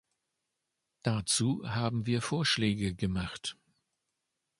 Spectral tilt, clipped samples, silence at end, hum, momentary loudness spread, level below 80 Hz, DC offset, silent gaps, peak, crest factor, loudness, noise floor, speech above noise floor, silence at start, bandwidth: -4 dB/octave; under 0.1%; 1.05 s; none; 9 LU; -54 dBFS; under 0.1%; none; -12 dBFS; 22 dB; -31 LUFS; -85 dBFS; 54 dB; 1.05 s; 11.5 kHz